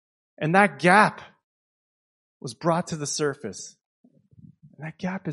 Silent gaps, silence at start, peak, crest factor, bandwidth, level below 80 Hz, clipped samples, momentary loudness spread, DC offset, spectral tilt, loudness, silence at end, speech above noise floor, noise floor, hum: 1.44-2.40 s, 3.86-4.04 s; 0.4 s; -2 dBFS; 24 dB; 11.5 kHz; -68 dBFS; under 0.1%; 23 LU; under 0.1%; -4.5 dB/octave; -22 LUFS; 0 s; 30 dB; -53 dBFS; none